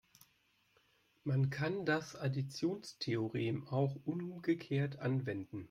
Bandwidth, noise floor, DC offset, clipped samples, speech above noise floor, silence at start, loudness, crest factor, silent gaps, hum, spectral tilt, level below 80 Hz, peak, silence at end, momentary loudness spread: 13 kHz; -75 dBFS; under 0.1%; under 0.1%; 38 dB; 1.25 s; -38 LUFS; 16 dB; none; none; -7 dB/octave; -74 dBFS; -22 dBFS; 0.05 s; 6 LU